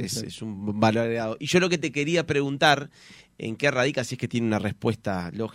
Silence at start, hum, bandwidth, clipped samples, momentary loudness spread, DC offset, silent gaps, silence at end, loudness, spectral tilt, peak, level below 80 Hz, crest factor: 0 s; none; 16 kHz; under 0.1%; 11 LU; under 0.1%; none; 0 s; -25 LUFS; -5 dB/octave; -4 dBFS; -60 dBFS; 22 dB